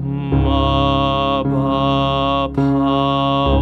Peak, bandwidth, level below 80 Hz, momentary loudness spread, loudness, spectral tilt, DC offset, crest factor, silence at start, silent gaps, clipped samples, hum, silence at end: -4 dBFS; 6.6 kHz; -26 dBFS; 2 LU; -17 LUFS; -8.5 dB/octave; under 0.1%; 12 dB; 0 s; none; under 0.1%; none; 0 s